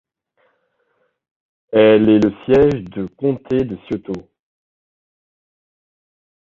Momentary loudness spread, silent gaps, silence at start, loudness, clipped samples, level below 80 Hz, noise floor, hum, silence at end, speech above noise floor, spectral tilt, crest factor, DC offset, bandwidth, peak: 15 LU; none; 1.7 s; -16 LUFS; under 0.1%; -48 dBFS; -66 dBFS; none; 2.35 s; 51 dB; -8 dB/octave; 18 dB; under 0.1%; 7 kHz; 0 dBFS